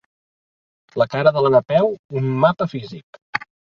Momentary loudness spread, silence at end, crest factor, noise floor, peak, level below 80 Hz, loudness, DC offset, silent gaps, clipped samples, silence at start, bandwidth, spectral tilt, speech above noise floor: 16 LU; 0.4 s; 20 dB; under -90 dBFS; 0 dBFS; -58 dBFS; -19 LUFS; under 0.1%; 1.99-2.09 s, 3.03-3.13 s, 3.22-3.33 s; under 0.1%; 0.95 s; 6.8 kHz; -8 dB/octave; over 72 dB